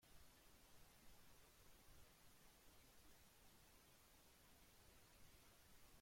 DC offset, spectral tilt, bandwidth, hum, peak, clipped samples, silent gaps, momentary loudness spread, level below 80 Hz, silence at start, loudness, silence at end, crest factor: under 0.1%; -2.5 dB/octave; 16.5 kHz; none; -54 dBFS; under 0.1%; none; 0 LU; -76 dBFS; 0 s; -70 LUFS; 0 s; 14 dB